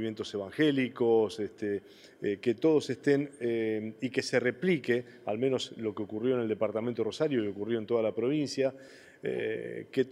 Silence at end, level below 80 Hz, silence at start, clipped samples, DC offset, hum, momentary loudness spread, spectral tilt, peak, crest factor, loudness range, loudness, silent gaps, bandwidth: 0 s; -78 dBFS; 0 s; under 0.1%; under 0.1%; none; 9 LU; -6 dB/octave; -12 dBFS; 18 dB; 2 LU; -31 LUFS; none; 12 kHz